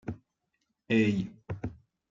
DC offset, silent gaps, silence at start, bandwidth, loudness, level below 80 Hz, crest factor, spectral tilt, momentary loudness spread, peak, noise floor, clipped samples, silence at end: under 0.1%; none; 0.05 s; 7.6 kHz; -30 LUFS; -58 dBFS; 18 dB; -7.5 dB/octave; 16 LU; -14 dBFS; -80 dBFS; under 0.1%; 0.4 s